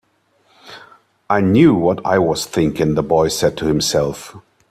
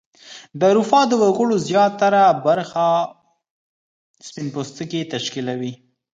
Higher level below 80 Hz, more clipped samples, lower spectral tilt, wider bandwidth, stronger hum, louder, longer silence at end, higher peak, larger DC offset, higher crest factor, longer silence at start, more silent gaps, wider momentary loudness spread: first, -44 dBFS vs -68 dBFS; neither; about the same, -5.5 dB/octave vs -5 dB/octave; first, 15 kHz vs 9.2 kHz; neither; about the same, -16 LUFS vs -18 LUFS; about the same, 0.3 s vs 0.4 s; about the same, 0 dBFS vs -2 dBFS; neither; about the same, 18 dB vs 18 dB; first, 0.65 s vs 0.25 s; second, none vs 3.51-4.14 s; second, 8 LU vs 14 LU